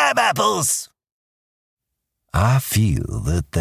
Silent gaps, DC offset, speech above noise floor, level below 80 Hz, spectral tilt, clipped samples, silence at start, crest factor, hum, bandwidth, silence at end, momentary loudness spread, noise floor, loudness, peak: 1.12-1.77 s; under 0.1%; 60 dB; -34 dBFS; -4 dB/octave; under 0.1%; 0 s; 16 dB; none; 16 kHz; 0 s; 7 LU; -79 dBFS; -19 LUFS; -4 dBFS